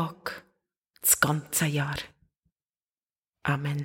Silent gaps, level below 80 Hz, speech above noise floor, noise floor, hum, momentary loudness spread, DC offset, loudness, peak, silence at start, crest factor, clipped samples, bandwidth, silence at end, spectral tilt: 0.78-0.82 s, 2.38-2.43 s, 2.52-2.56 s, 2.82-2.87 s, 3.05-3.10 s, 3.18-3.22 s, 3.29-3.33 s; -58 dBFS; over 63 dB; under -90 dBFS; none; 17 LU; under 0.1%; -26 LUFS; -6 dBFS; 0 s; 24 dB; under 0.1%; 17 kHz; 0 s; -3.5 dB/octave